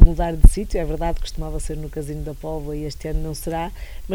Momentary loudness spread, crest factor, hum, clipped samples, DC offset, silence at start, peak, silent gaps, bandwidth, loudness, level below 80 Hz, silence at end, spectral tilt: 13 LU; 18 dB; none; 0.4%; under 0.1%; 0 s; 0 dBFS; none; 13 kHz; -24 LUFS; -18 dBFS; 0 s; -6.5 dB/octave